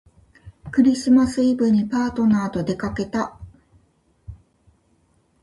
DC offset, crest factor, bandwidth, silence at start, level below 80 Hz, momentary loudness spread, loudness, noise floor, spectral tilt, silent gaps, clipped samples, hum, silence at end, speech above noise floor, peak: under 0.1%; 16 dB; 11.5 kHz; 0.45 s; -48 dBFS; 10 LU; -20 LUFS; -62 dBFS; -6.5 dB/octave; none; under 0.1%; none; 1.05 s; 43 dB; -6 dBFS